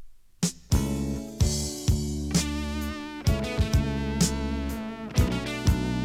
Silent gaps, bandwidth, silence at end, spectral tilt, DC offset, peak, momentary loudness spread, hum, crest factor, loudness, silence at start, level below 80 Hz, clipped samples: none; 16.5 kHz; 0 s; -5 dB/octave; under 0.1%; -10 dBFS; 6 LU; none; 16 dB; -28 LUFS; 0 s; -32 dBFS; under 0.1%